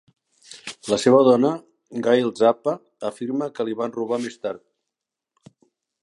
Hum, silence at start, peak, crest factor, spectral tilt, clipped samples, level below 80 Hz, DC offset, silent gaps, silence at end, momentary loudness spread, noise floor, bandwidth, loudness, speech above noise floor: none; 0.5 s; -2 dBFS; 20 dB; -5.5 dB/octave; under 0.1%; -70 dBFS; under 0.1%; none; 1.45 s; 19 LU; -85 dBFS; 11.5 kHz; -21 LUFS; 64 dB